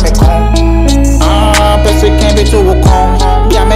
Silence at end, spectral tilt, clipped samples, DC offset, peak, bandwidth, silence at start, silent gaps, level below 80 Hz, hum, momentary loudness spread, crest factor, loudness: 0 s; -5.5 dB/octave; under 0.1%; under 0.1%; 0 dBFS; 14.5 kHz; 0 s; none; -8 dBFS; none; 2 LU; 6 dB; -8 LUFS